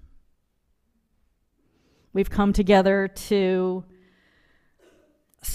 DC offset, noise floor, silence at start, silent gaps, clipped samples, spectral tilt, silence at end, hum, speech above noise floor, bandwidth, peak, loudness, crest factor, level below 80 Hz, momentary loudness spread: under 0.1%; -70 dBFS; 2.15 s; none; under 0.1%; -6 dB/octave; 0 s; none; 49 dB; 15 kHz; -4 dBFS; -22 LUFS; 22 dB; -42 dBFS; 13 LU